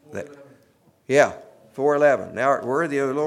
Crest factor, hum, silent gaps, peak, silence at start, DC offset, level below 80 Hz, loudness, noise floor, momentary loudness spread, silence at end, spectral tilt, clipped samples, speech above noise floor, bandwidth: 18 dB; none; none; -4 dBFS; 0.1 s; under 0.1%; -70 dBFS; -21 LUFS; -59 dBFS; 20 LU; 0 s; -5.5 dB/octave; under 0.1%; 38 dB; 12.5 kHz